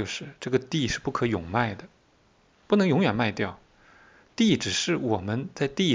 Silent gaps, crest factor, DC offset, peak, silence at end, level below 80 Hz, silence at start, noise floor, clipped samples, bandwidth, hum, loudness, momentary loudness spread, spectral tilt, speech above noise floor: none; 18 dB; under 0.1%; -8 dBFS; 0 s; -52 dBFS; 0 s; -62 dBFS; under 0.1%; 7.6 kHz; none; -26 LUFS; 10 LU; -5 dB/octave; 37 dB